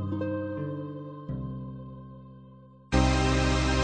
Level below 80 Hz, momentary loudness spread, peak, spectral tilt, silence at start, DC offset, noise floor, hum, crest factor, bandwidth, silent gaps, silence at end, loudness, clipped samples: -34 dBFS; 22 LU; -8 dBFS; -5.5 dB/octave; 0 s; under 0.1%; -51 dBFS; none; 20 dB; 9.2 kHz; none; 0 s; -29 LUFS; under 0.1%